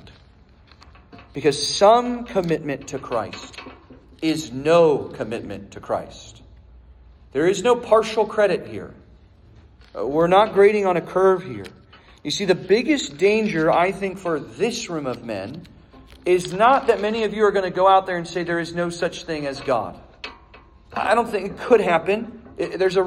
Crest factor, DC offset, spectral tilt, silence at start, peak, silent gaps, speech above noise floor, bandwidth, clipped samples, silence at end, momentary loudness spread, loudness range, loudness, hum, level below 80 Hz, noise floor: 20 dB; under 0.1%; -5 dB/octave; 0.05 s; -2 dBFS; none; 31 dB; 13 kHz; under 0.1%; 0 s; 19 LU; 4 LU; -20 LUFS; none; -52 dBFS; -51 dBFS